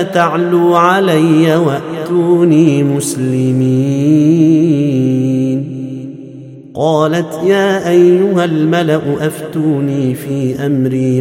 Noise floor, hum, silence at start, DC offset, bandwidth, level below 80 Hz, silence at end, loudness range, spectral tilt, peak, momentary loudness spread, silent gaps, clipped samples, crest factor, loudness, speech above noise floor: -31 dBFS; none; 0 s; under 0.1%; 16 kHz; -56 dBFS; 0 s; 3 LU; -7 dB/octave; 0 dBFS; 8 LU; none; under 0.1%; 12 dB; -12 LUFS; 20 dB